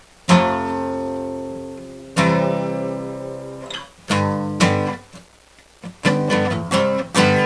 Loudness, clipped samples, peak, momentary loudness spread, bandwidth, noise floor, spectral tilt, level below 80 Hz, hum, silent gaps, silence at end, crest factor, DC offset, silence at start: -20 LUFS; under 0.1%; -2 dBFS; 16 LU; 11 kHz; -50 dBFS; -5.5 dB/octave; -54 dBFS; none; none; 0 s; 20 dB; under 0.1%; 0.3 s